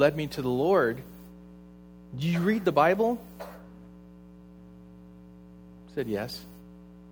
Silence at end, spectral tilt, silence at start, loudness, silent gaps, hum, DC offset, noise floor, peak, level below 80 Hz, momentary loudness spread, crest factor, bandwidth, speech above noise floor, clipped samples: 0 s; -7 dB/octave; 0 s; -27 LUFS; none; none; under 0.1%; -50 dBFS; -8 dBFS; -56 dBFS; 27 LU; 22 dB; over 20 kHz; 23 dB; under 0.1%